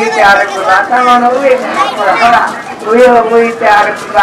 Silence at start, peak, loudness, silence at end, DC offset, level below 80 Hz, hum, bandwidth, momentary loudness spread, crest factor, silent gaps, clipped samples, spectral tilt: 0 s; 0 dBFS; -8 LUFS; 0 s; under 0.1%; -44 dBFS; none; 14.5 kHz; 5 LU; 8 dB; none; 2%; -3.5 dB/octave